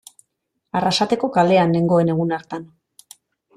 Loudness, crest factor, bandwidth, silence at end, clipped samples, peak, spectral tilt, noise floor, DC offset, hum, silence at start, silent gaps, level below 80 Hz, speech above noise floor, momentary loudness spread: -18 LUFS; 16 dB; 13.5 kHz; 0.9 s; under 0.1%; -4 dBFS; -6 dB/octave; -75 dBFS; under 0.1%; none; 0.75 s; none; -60 dBFS; 57 dB; 12 LU